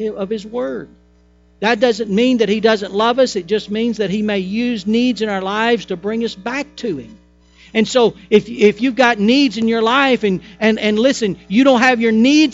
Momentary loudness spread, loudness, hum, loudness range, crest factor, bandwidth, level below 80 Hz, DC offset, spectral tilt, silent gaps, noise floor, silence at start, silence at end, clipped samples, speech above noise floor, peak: 10 LU; -16 LUFS; 60 Hz at -45 dBFS; 5 LU; 16 dB; 8 kHz; -52 dBFS; under 0.1%; -5 dB/octave; none; -51 dBFS; 0 s; 0 s; under 0.1%; 36 dB; 0 dBFS